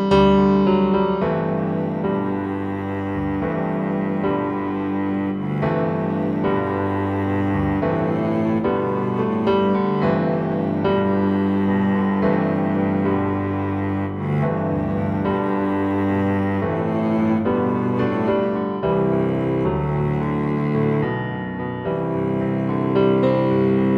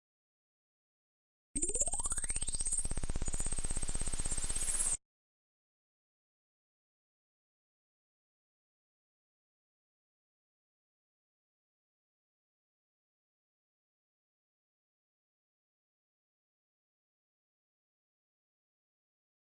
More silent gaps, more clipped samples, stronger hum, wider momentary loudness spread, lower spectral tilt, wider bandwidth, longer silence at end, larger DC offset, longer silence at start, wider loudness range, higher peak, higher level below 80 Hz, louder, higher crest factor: neither; neither; second, none vs 50 Hz at -65 dBFS; about the same, 5 LU vs 7 LU; first, -9.5 dB/octave vs -2 dB/octave; second, 6 kHz vs 11.5 kHz; second, 0 s vs 14.6 s; neither; second, 0 s vs 1.55 s; about the same, 3 LU vs 4 LU; first, -4 dBFS vs -18 dBFS; about the same, -44 dBFS vs -46 dBFS; first, -21 LUFS vs -35 LUFS; second, 16 dB vs 22 dB